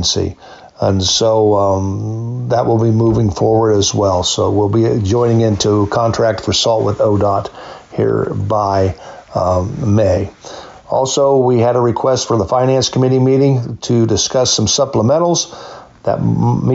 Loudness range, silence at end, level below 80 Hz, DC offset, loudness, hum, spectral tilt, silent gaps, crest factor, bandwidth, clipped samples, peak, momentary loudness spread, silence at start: 3 LU; 0 s; -40 dBFS; under 0.1%; -14 LUFS; none; -5.5 dB/octave; none; 10 dB; 8 kHz; under 0.1%; -4 dBFS; 9 LU; 0 s